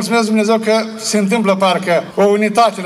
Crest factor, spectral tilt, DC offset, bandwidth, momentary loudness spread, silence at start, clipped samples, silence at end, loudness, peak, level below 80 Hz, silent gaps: 12 dB; -4.5 dB/octave; under 0.1%; 14 kHz; 4 LU; 0 s; under 0.1%; 0 s; -14 LUFS; -2 dBFS; -62 dBFS; none